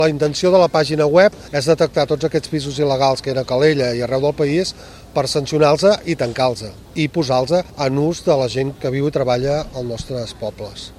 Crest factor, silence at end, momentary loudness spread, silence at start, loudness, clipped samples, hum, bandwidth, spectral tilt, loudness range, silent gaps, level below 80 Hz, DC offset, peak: 18 dB; 0.05 s; 12 LU; 0 s; -17 LUFS; under 0.1%; none; 14 kHz; -5.5 dB/octave; 3 LU; none; -44 dBFS; under 0.1%; 0 dBFS